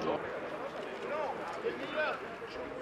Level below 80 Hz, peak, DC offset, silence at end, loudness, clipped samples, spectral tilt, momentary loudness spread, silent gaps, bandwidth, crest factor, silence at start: -68 dBFS; -20 dBFS; under 0.1%; 0 s; -38 LUFS; under 0.1%; -5 dB/octave; 7 LU; none; 14 kHz; 16 dB; 0 s